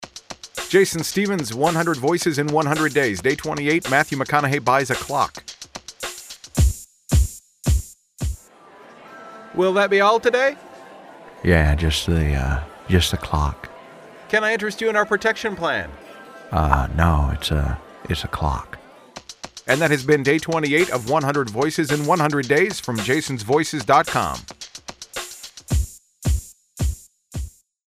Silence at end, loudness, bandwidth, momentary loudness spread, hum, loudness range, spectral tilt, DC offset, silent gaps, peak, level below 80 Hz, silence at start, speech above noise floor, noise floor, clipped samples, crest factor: 0.45 s; -21 LUFS; 15.5 kHz; 19 LU; none; 5 LU; -5 dB/octave; under 0.1%; none; 0 dBFS; -30 dBFS; 0 s; 27 dB; -47 dBFS; under 0.1%; 20 dB